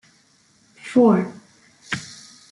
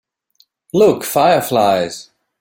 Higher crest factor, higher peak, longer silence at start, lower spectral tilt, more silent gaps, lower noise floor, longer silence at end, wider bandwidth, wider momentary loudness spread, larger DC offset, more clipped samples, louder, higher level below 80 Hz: about the same, 18 dB vs 14 dB; about the same, -4 dBFS vs -2 dBFS; about the same, 0.85 s vs 0.75 s; first, -6.5 dB/octave vs -4.5 dB/octave; neither; about the same, -58 dBFS vs -58 dBFS; about the same, 0.45 s vs 0.4 s; second, 11.5 kHz vs 17 kHz; first, 24 LU vs 10 LU; neither; neither; second, -20 LUFS vs -15 LUFS; second, -66 dBFS vs -56 dBFS